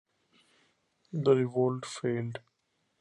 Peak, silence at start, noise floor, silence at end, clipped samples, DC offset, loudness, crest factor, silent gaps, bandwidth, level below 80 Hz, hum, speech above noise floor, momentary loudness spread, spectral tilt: -12 dBFS; 1.15 s; -77 dBFS; 0.6 s; under 0.1%; under 0.1%; -30 LUFS; 20 dB; none; 11 kHz; -74 dBFS; none; 48 dB; 14 LU; -7 dB/octave